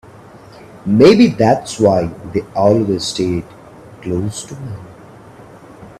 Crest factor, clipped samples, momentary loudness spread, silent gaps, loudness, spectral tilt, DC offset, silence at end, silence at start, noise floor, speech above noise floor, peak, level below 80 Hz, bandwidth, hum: 16 dB; under 0.1%; 19 LU; none; -14 LUFS; -6 dB/octave; under 0.1%; 0.1 s; 0.35 s; -39 dBFS; 25 dB; 0 dBFS; -48 dBFS; 13 kHz; none